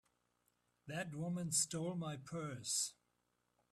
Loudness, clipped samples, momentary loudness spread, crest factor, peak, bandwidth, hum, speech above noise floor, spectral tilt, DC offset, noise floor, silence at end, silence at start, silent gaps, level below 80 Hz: -41 LUFS; under 0.1%; 10 LU; 22 dB; -22 dBFS; 14.5 kHz; 60 Hz at -65 dBFS; 41 dB; -3.5 dB/octave; under 0.1%; -83 dBFS; 0.8 s; 0.85 s; none; -78 dBFS